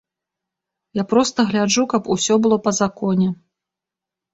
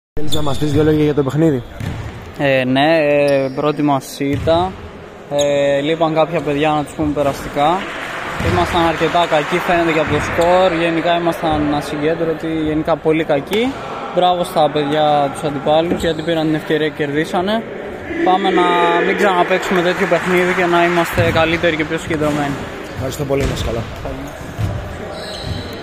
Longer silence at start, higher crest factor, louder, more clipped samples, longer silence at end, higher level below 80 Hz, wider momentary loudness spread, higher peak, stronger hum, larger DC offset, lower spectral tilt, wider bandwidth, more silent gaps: first, 0.95 s vs 0.15 s; about the same, 18 dB vs 14 dB; about the same, -18 LUFS vs -16 LUFS; neither; first, 1 s vs 0 s; second, -58 dBFS vs -38 dBFS; second, 8 LU vs 11 LU; about the same, -2 dBFS vs -2 dBFS; neither; neither; about the same, -4.5 dB/octave vs -5.5 dB/octave; second, 8.2 kHz vs 15.5 kHz; neither